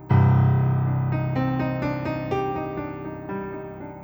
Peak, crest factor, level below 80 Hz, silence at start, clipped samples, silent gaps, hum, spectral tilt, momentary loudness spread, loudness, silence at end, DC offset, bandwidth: -8 dBFS; 16 dB; -46 dBFS; 0 s; under 0.1%; none; none; -10 dB/octave; 15 LU; -24 LUFS; 0 s; under 0.1%; over 20 kHz